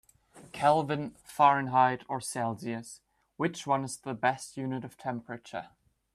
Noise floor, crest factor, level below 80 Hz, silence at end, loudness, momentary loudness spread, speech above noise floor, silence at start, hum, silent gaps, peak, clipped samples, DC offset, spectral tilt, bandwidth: -56 dBFS; 22 dB; -70 dBFS; 0.45 s; -30 LUFS; 15 LU; 26 dB; 0.35 s; none; none; -8 dBFS; under 0.1%; under 0.1%; -5 dB/octave; 14 kHz